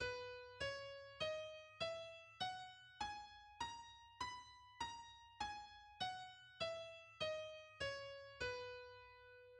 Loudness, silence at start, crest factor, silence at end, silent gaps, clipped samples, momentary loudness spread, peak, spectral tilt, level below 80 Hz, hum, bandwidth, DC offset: -49 LUFS; 0 s; 18 dB; 0 s; none; under 0.1%; 12 LU; -32 dBFS; -2.5 dB/octave; -72 dBFS; none; 11 kHz; under 0.1%